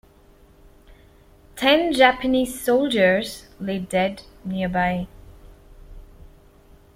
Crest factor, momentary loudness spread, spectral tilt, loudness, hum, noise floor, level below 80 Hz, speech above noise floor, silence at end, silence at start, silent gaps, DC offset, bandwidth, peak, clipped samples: 22 dB; 16 LU; -5 dB/octave; -21 LUFS; none; -52 dBFS; -48 dBFS; 32 dB; 0.75 s; 0.9 s; none; under 0.1%; 16.5 kHz; -2 dBFS; under 0.1%